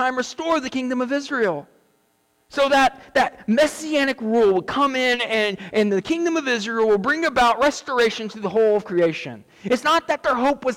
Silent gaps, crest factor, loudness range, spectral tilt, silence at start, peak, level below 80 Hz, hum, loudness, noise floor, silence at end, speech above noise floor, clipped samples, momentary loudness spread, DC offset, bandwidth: none; 12 dB; 2 LU; -4 dB/octave; 0 s; -10 dBFS; -54 dBFS; none; -20 LUFS; -65 dBFS; 0 s; 44 dB; under 0.1%; 6 LU; under 0.1%; 17 kHz